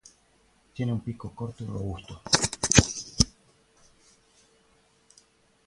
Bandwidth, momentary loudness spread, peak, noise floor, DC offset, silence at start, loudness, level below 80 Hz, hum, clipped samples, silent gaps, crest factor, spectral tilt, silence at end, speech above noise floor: 11.5 kHz; 17 LU; 0 dBFS; -64 dBFS; under 0.1%; 0.75 s; -26 LUFS; -44 dBFS; none; under 0.1%; none; 30 dB; -3 dB/octave; 2.4 s; 32 dB